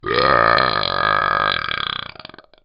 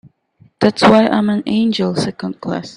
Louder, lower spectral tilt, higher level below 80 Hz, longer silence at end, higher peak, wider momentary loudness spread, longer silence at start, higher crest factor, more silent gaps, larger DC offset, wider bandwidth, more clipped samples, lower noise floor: about the same, -17 LUFS vs -15 LUFS; second, -0.5 dB/octave vs -6 dB/octave; first, -44 dBFS vs -52 dBFS; first, 0.45 s vs 0.05 s; about the same, 0 dBFS vs 0 dBFS; about the same, 10 LU vs 12 LU; second, 0.05 s vs 0.6 s; about the same, 18 dB vs 16 dB; neither; neither; second, 5.6 kHz vs 11 kHz; neither; second, -41 dBFS vs -52 dBFS